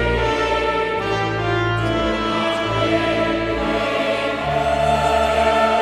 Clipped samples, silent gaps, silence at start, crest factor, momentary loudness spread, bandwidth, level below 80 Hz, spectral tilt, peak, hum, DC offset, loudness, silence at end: under 0.1%; none; 0 s; 14 dB; 4 LU; 13 kHz; -34 dBFS; -5.5 dB/octave; -6 dBFS; none; under 0.1%; -19 LUFS; 0 s